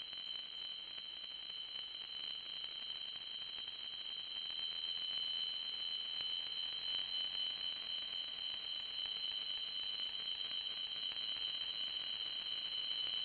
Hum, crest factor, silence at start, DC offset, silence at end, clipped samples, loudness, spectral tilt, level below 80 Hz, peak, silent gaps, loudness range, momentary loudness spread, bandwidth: none; 16 dB; 0 s; under 0.1%; 0 s; under 0.1%; -40 LUFS; -2 dB/octave; -78 dBFS; -28 dBFS; none; 5 LU; 6 LU; 10.5 kHz